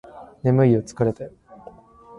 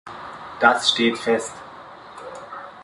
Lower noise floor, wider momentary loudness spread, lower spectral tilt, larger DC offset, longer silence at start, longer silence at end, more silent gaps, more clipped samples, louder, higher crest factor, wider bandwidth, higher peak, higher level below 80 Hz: first, -47 dBFS vs -41 dBFS; second, 18 LU vs 23 LU; first, -9 dB/octave vs -2.5 dB/octave; neither; about the same, 0.15 s vs 0.05 s; first, 0.9 s vs 0 s; neither; neither; about the same, -21 LUFS vs -19 LUFS; second, 16 dB vs 22 dB; about the same, 10.5 kHz vs 11.5 kHz; second, -6 dBFS vs -2 dBFS; first, -54 dBFS vs -62 dBFS